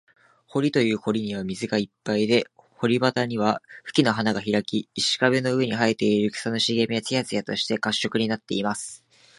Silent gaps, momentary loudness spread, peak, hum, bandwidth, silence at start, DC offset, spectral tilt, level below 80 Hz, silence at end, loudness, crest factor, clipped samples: none; 7 LU; -4 dBFS; none; 11.5 kHz; 0.55 s; under 0.1%; -4.5 dB/octave; -64 dBFS; 0.45 s; -24 LUFS; 20 dB; under 0.1%